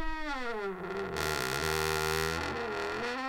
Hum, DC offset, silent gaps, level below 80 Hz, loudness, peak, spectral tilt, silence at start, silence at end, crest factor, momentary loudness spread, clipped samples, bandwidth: none; under 0.1%; none; -46 dBFS; -33 LUFS; -18 dBFS; -3.5 dB/octave; 0 s; 0 s; 16 dB; 6 LU; under 0.1%; 17 kHz